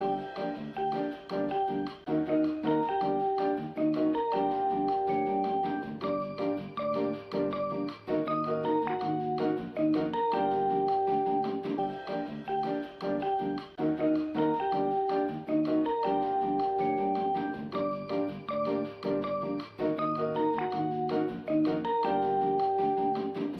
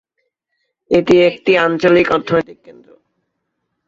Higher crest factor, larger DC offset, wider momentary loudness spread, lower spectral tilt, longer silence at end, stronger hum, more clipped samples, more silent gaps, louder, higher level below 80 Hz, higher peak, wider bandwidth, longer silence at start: about the same, 14 dB vs 16 dB; neither; about the same, 6 LU vs 7 LU; first, -8.5 dB/octave vs -6.5 dB/octave; second, 0 s vs 1.15 s; neither; neither; neither; second, -30 LUFS vs -13 LUFS; second, -66 dBFS vs -50 dBFS; second, -16 dBFS vs 0 dBFS; second, 6 kHz vs 7.6 kHz; second, 0 s vs 0.9 s